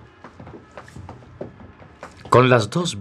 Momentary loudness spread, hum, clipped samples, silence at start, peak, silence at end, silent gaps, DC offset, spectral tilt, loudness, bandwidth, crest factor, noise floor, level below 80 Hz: 27 LU; none; under 0.1%; 0.25 s; 0 dBFS; 0 s; none; under 0.1%; -5.5 dB/octave; -17 LUFS; 12 kHz; 22 dB; -44 dBFS; -54 dBFS